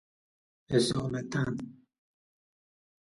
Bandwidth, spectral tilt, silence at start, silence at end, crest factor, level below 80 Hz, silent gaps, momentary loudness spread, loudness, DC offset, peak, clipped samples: 11.5 kHz; -5.5 dB/octave; 0.7 s; 1.35 s; 20 dB; -60 dBFS; none; 11 LU; -31 LUFS; under 0.1%; -14 dBFS; under 0.1%